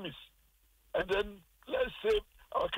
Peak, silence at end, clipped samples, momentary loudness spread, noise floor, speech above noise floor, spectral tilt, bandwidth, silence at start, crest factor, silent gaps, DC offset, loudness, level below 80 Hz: -22 dBFS; 0 s; under 0.1%; 13 LU; -68 dBFS; 34 dB; -4.5 dB/octave; 16 kHz; 0 s; 14 dB; none; under 0.1%; -35 LUFS; -54 dBFS